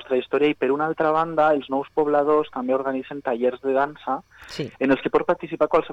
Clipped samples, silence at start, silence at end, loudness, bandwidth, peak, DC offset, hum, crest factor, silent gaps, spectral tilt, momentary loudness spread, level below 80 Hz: under 0.1%; 0 s; 0 s; -22 LUFS; 8.4 kHz; -8 dBFS; under 0.1%; none; 14 dB; none; -7 dB/octave; 9 LU; -58 dBFS